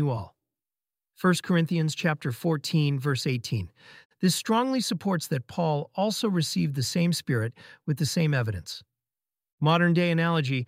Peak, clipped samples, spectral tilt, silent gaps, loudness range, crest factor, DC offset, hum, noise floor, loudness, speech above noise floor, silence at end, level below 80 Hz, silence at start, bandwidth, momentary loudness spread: -8 dBFS; under 0.1%; -5.5 dB/octave; 4.05-4.10 s, 9.53-9.58 s; 1 LU; 18 dB; under 0.1%; none; under -90 dBFS; -26 LUFS; over 64 dB; 0 s; -62 dBFS; 0 s; 16 kHz; 9 LU